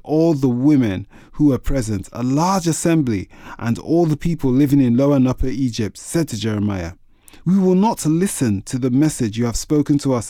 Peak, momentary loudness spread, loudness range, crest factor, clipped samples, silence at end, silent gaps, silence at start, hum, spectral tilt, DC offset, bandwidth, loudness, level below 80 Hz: -4 dBFS; 10 LU; 2 LU; 14 dB; under 0.1%; 0 s; none; 0.05 s; none; -6.5 dB/octave; under 0.1%; 16.5 kHz; -18 LUFS; -34 dBFS